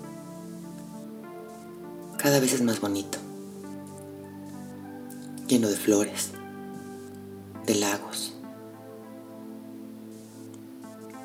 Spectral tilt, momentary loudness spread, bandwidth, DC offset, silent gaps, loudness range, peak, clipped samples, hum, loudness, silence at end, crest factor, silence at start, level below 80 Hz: -4 dB/octave; 20 LU; over 20 kHz; under 0.1%; none; 5 LU; -8 dBFS; under 0.1%; none; -28 LUFS; 0 s; 22 dB; 0 s; -74 dBFS